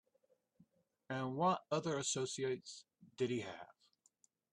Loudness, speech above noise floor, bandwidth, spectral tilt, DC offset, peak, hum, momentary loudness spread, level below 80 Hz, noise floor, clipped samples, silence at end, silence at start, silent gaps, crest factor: -40 LUFS; 39 dB; 11.5 kHz; -4 dB/octave; under 0.1%; -24 dBFS; none; 18 LU; -84 dBFS; -78 dBFS; under 0.1%; 0.8 s; 1.1 s; none; 18 dB